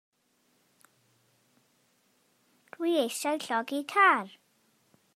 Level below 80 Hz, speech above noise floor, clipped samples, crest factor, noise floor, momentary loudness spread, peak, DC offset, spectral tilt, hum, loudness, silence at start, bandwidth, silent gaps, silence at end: under -90 dBFS; 44 dB; under 0.1%; 22 dB; -71 dBFS; 10 LU; -10 dBFS; under 0.1%; -2.5 dB/octave; none; -27 LUFS; 2.8 s; 15.5 kHz; none; 0.9 s